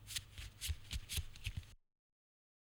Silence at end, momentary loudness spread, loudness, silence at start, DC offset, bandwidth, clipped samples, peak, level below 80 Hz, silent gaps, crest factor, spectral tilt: 0.95 s; 10 LU; -46 LUFS; 0 s; under 0.1%; over 20 kHz; under 0.1%; -28 dBFS; -52 dBFS; none; 20 dB; -2 dB/octave